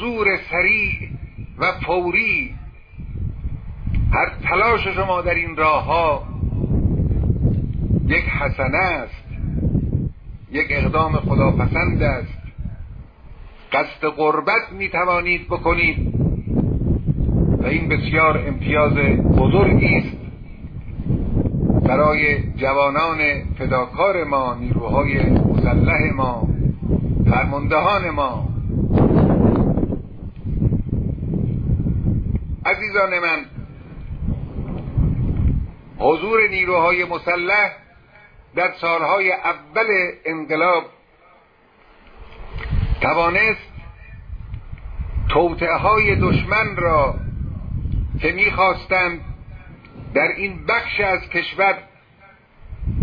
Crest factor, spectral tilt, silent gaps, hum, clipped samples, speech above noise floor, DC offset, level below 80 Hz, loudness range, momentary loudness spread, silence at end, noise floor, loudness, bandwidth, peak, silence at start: 16 dB; -9.5 dB/octave; none; none; under 0.1%; 35 dB; under 0.1%; -28 dBFS; 4 LU; 16 LU; 0 s; -53 dBFS; -19 LUFS; 5.2 kHz; -2 dBFS; 0 s